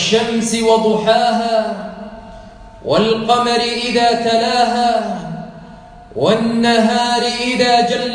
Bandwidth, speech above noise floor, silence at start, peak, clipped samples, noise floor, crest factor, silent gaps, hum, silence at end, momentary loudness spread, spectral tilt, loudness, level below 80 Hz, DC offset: 10.5 kHz; 23 dB; 0 s; 0 dBFS; under 0.1%; -37 dBFS; 16 dB; none; none; 0 s; 17 LU; -4 dB/octave; -15 LUFS; -46 dBFS; under 0.1%